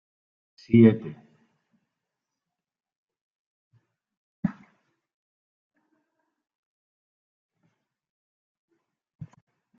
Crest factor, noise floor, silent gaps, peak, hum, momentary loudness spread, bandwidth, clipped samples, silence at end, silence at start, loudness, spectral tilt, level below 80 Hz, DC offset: 26 dB; -90 dBFS; 2.96-3.06 s, 3.21-3.71 s, 4.17-4.43 s; -4 dBFS; none; 16 LU; 5.4 kHz; under 0.1%; 5.25 s; 0.7 s; -22 LUFS; -9 dB/octave; -68 dBFS; under 0.1%